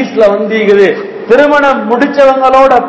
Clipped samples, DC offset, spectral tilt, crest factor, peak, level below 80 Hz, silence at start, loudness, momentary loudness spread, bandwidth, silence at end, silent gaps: 7%; under 0.1%; -6 dB/octave; 8 dB; 0 dBFS; -44 dBFS; 0 s; -7 LUFS; 5 LU; 8 kHz; 0 s; none